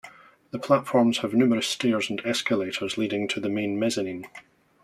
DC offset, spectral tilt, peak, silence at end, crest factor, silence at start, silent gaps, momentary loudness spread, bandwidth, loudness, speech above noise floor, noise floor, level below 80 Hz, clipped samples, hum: under 0.1%; -4.5 dB/octave; -6 dBFS; 0.45 s; 20 dB; 0.05 s; none; 11 LU; 13.5 kHz; -25 LUFS; 25 dB; -49 dBFS; -68 dBFS; under 0.1%; none